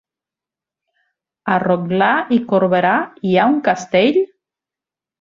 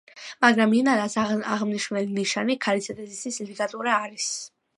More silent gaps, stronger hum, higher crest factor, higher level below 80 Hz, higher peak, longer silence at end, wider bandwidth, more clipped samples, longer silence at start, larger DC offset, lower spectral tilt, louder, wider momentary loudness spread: neither; neither; second, 16 dB vs 22 dB; first, -60 dBFS vs -70 dBFS; about the same, -2 dBFS vs -4 dBFS; first, 0.95 s vs 0.3 s; second, 7.6 kHz vs 11.5 kHz; neither; first, 1.45 s vs 0.15 s; neither; first, -6.5 dB/octave vs -3.5 dB/octave; first, -16 LUFS vs -24 LUFS; second, 5 LU vs 12 LU